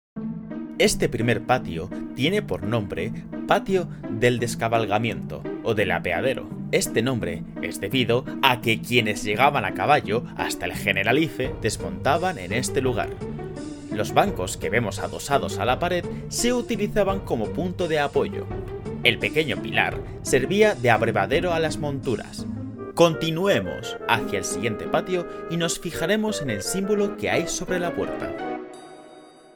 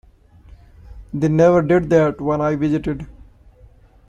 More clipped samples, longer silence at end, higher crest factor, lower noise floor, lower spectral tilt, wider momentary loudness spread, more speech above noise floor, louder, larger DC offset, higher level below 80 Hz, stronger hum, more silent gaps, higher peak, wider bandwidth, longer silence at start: neither; second, 0.25 s vs 1 s; first, 24 dB vs 16 dB; about the same, -47 dBFS vs -48 dBFS; second, -4.5 dB/octave vs -8.5 dB/octave; second, 11 LU vs 16 LU; second, 24 dB vs 31 dB; second, -24 LUFS vs -17 LUFS; neither; about the same, -44 dBFS vs -42 dBFS; neither; neither; about the same, 0 dBFS vs -2 dBFS; first, 19.5 kHz vs 7.8 kHz; second, 0.15 s vs 0.5 s